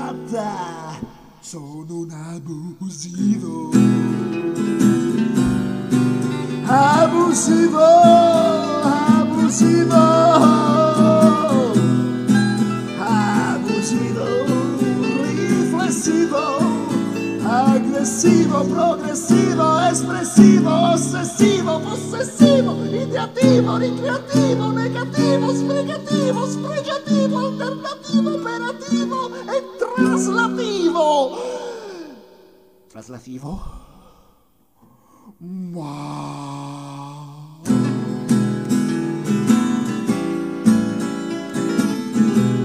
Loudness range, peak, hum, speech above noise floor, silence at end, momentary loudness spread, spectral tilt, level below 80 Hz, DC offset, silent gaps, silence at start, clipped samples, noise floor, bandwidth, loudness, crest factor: 13 LU; 0 dBFS; none; 42 dB; 0 s; 17 LU; -5.5 dB/octave; -50 dBFS; under 0.1%; none; 0 s; under 0.1%; -59 dBFS; 14.5 kHz; -17 LUFS; 18 dB